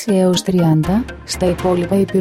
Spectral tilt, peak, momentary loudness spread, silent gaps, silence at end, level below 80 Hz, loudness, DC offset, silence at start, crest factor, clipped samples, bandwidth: -6 dB/octave; -4 dBFS; 5 LU; none; 0 s; -36 dBFS; -16 LUFS; under 0.1%; 0 s; 12 dB; under 0.1%; 15.5 kHz